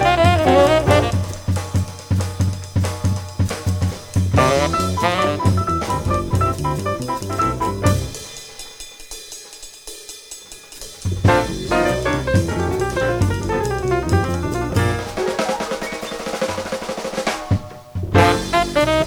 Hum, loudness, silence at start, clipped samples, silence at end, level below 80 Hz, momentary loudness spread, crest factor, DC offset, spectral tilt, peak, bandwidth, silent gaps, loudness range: none; -19 LUFS; 0 s; under 0.1%; 0 s; -34 dBFS; 18 LU; 18 dB; under 0.1%; -5.5 dB/octave; -2 dBFS; 17.5 kHz; none; 6 LU